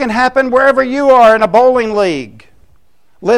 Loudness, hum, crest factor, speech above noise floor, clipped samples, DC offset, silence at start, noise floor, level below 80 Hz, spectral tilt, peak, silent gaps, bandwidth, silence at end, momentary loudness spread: -10 LUFS; none; 12 dB; 45 dB; under 0.1%; 0.7%; 0 s; -55 dBFS; -44 dBFS; -5 dB/octave; 0 dBFS; none; 11.5 kHz; 0 s; 9 LU